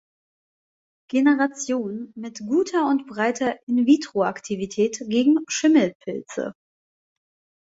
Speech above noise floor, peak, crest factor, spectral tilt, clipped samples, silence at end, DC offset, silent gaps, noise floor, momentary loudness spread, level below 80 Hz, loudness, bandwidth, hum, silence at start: over 68 dB; -6 dBFS; 18 dB; -4.5 dB/octave; under 0.1%; 1.15 s; under 0.1%; 3.63-3.67 s, 5.95-6.00 s; under -90 dBFS; 13 LU; -68 dBFS; -22 LUFS; 8 kHz; none; 1.15 s